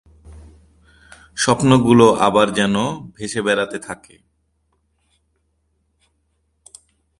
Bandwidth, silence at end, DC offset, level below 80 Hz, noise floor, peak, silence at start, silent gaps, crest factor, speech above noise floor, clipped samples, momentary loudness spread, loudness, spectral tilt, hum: 11.5 kHz; 3.25 s; under 0.1%; -50 dBFS; -67 dBFS; 0 dBFS; 0.3 s; none; 20 dB; 51 dB; under 0.1%; 19 LU; -16 LUFS; -5 dB/octave; none